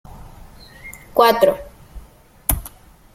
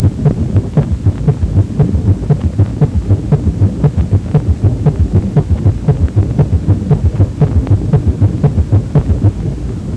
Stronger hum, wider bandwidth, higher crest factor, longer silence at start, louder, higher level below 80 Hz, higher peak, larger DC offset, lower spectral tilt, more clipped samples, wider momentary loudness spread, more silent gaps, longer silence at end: neither; first, 16.5 kHz vs 8.6 kHz; first, 22 dB vs 12 dB; first, 0.15 s vs 0 s; second, -18 LUFS vs -13 LUFS; second, -36 dBFS vs -20 dBFS; about the same, 0 dBFS vs 0 dBFS; neither; second, -3.5 dB/octave vs -10 dB/octave; neither; first, 25 LU vs 3 LU; neither; first, 0.45 s vs 0 s